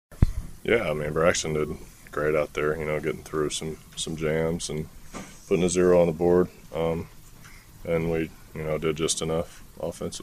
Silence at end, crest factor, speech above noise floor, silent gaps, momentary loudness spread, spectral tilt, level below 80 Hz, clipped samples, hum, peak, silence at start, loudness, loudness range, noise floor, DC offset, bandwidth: 0 s; 22 dB; 21 dB; none; 14 LU; -5 dB/octave; -38 dBFS; under 0.1%; none; -4 dBFS; 0.1 s; -26 LUFS; 4 LU; -47 dBFS; under 0.1%; 15.5 kHz